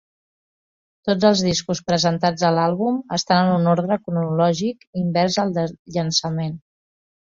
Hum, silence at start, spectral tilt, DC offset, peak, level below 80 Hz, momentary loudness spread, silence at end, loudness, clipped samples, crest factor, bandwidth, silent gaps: none; 1.05 s; -5 dB/octave; under 0.1%; -2 dBFS; -56 dBFS; 9 LU; 0.8 s; -20 LUFS; under 0.1%; 18 dB; 7.6 kHz; 4.87-4.93 s, 5.79-5.85 s